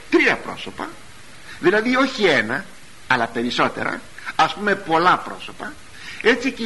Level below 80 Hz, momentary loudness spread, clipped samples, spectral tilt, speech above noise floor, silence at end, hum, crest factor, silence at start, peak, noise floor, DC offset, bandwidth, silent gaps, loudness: -52 dBFS; 17 LU; under 0.1%; -4 dB/octave; 21 dB; 0 s; none; 18 dB; 0 s; -2 dBFS; -41 dBFS; 1%; 11.5 kHz; none; -19 LUFS